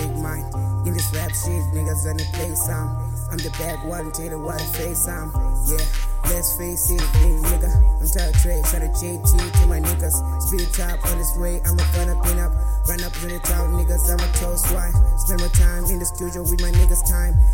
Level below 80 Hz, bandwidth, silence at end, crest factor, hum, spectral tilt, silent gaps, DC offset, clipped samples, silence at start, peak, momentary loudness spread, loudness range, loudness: -20 dBFS; 17 kHz; 0 s; 16 dB; none; -4.5 dB/octave; none; under 0.1%; under 0.1%; 0 s; -2 dBFS; 8 LU; 5 LU; -21 LUFS